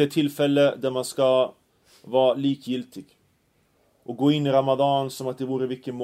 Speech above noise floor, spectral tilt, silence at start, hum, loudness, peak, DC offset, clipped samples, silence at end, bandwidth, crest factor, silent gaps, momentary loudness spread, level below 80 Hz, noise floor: 43 dB; -6 dB/octave; 0 s; none; -23 LUFS; -6 dBFS; under 0.1%; under 0.1%; 0 s; 15.5 kHz; 18 dB; none; 11 LU; -70 dBFS; -66 dBFS